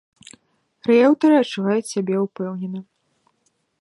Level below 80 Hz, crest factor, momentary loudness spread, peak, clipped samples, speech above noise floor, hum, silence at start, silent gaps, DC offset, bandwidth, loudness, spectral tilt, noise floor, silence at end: -74 dBFS; 16 dB; 15 LU; -4 dBFS; under 0.1%; 50 dB; none; 0.85 s; none; under 0.1%; 11.5 kHz; -19 LUFS; -6 dB/octave; -68 dBFS; 1 s